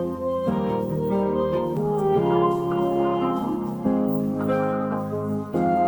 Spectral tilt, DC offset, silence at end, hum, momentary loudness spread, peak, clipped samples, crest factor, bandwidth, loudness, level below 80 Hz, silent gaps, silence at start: -9 dB/octave; under 0.1%; 0 s; none; 5 LU; -8 dBFS; under 0.1%; 14 dB; over 20 kHz; -24 LUFS; -50 dBFS; none; 0 s